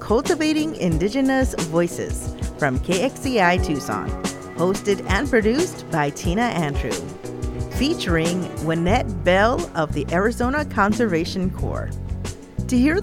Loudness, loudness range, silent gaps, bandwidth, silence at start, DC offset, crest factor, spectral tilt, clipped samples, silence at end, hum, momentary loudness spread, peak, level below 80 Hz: -22 LUFS; 2 LU; none; 17 kHz; 0 s; under 0.1%; 18 dB; -5.5 dB/octave; under 0.1%; 0 s; none; 10 LU; -4 dBFS; -32 dBFS